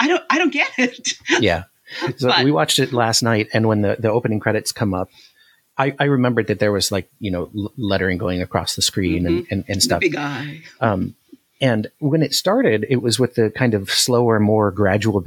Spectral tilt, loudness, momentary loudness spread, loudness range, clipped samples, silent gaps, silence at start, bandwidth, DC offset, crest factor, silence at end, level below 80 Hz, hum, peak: -4.5 dB/octave; -18 LUFS; 9 LU; 3 LU; under 0.1%; none; 0 s; 18 kHz; under 0.1%; 18 dB; 0 s; -56 dBFS; none; 0 dBFS